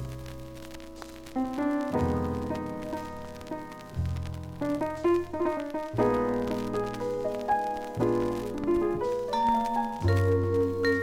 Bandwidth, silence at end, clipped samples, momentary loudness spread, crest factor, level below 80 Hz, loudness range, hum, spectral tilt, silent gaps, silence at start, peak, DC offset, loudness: 16.5 kHz; 0 s; under 0.1%; 14 LU; 16 dB; -48 dBFS; 5 LU; none; -7.5 dB/octave; none; 0 s; -12 dBFS; under 0.1%; -29 LUFS